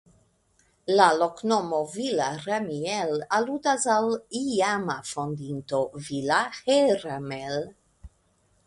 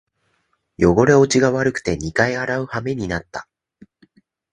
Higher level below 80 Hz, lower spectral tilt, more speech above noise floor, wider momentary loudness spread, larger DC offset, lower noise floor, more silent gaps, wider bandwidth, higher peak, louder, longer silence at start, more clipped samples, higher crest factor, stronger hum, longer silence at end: second, -62 dBFS vs -42 dBFS; second, -4 dB/octave vs -5.5 dB/octave; second, 41 dB vs 50 dB; about the same, 11 LU vs 12 LU; neither; about the same, -66 dBFS vs -67 dBFS; neither; about the same, 11.5 kHz vs 11 kHz; about the same, -2 dBFS vs 0 dBFS; second, -26 LUFS vs -18 LUFS; about the same, 0.85 s vs 0.8 s; neither; about the same, 24 dB vs 20 dB; neither; second, 0.6 s vs 1.1 s